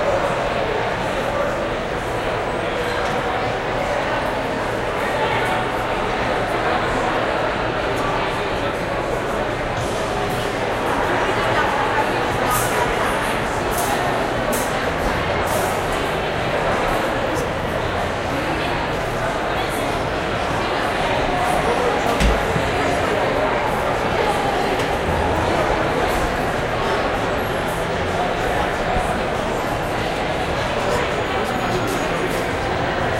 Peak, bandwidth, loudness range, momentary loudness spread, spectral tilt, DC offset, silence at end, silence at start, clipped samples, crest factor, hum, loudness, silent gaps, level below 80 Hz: -4 dBFS; 16 kHz; 2 LU; 3 LU; -4.5 dB/octave; under 0.1%; 0 s; 0 s; under 0.1%; 16 dB; none; -20 LUFS; none; -34 dBFS